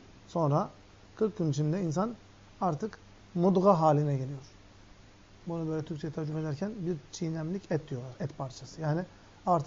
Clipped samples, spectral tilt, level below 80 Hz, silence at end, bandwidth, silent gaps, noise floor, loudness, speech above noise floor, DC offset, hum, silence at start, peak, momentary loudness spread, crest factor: under 0.1%; -8 dB/octave; -62 dBFS; 0 s; 7.6 kHz; none; -55 dBFS; -32 LUFS; 25 dB; under 0.1%; none; 0.05 s; -12 dBFS; 15 LU; 20 dB